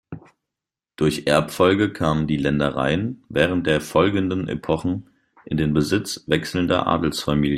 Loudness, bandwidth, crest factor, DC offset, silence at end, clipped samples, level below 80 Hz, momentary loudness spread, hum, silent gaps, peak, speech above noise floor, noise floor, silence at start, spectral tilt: -21 LUFS; 16 kHz; 20 dB; under 0.1%; 0 s; under 0.1%; -46 dBFS; 7 LU; none; none; -2 dBFS; 66 dB; -87 dBFS; 0.1 s; -6 dB/octave